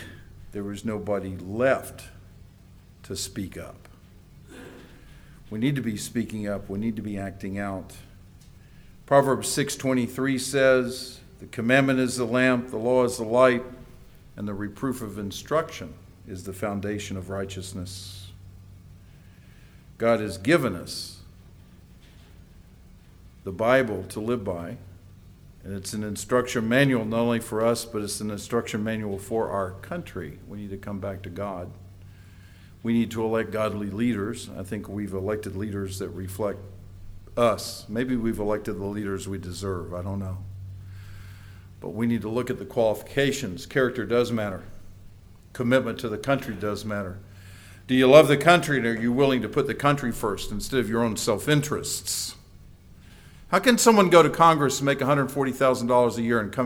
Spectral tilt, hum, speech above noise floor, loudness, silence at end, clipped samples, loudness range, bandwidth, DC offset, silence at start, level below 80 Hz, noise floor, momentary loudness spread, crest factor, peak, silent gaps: -5 dB/octave; none; 26 dB; -25 LUFS; 0 s; under 0.1%; 12 LU; 20 kHz; under 0.1%; 0 s; -50 dBFS; -50 dBFS; 19 LU; 24 dB; -2 dBFS; none